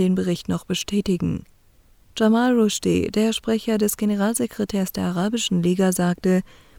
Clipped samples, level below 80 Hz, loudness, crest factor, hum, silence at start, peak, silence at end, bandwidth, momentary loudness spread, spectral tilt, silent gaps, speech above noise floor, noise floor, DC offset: under 0.1%; -50 dBFS; -22 LUFS; 16 dB; none; 0 s; -6 dBFS; 0.35 s; 18 kHz; 6 LU; -5.5 dB/octave; none; 33 dB; -54 dBFS; under 0.1%